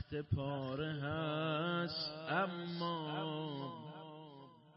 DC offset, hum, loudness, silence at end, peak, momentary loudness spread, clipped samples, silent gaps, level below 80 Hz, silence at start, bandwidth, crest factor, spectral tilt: under 0.1%; none; -40 LUFS; 0.05 s; -24 dBFS; 15 LU; under 0.1%; none; -66 dBFS; 0 s; 5.6 kHz; 16 dB; -4.5 dB/octave